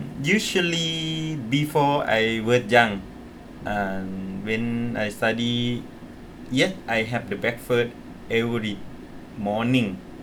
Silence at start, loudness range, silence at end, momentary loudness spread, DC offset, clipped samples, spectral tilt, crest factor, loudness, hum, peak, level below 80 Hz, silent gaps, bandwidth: 0 s; 5 LU; 0 s; 20 LU; under 0.1%; under 0.1%; -5 dB/octave; 22 dB; -24 LUFS; none; -2 dBFS; -50 dBFS; none; 18.5 kHz